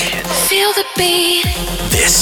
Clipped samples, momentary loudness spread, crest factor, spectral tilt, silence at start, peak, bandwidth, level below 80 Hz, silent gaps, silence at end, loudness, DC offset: under 0.1%; 5 LU; 12 dB; -2 dB/octave; 0 s; -2 dBFS; 17.5 kHz; -28 dBFS; none; 0 s; -13 LUFS; under 0.1%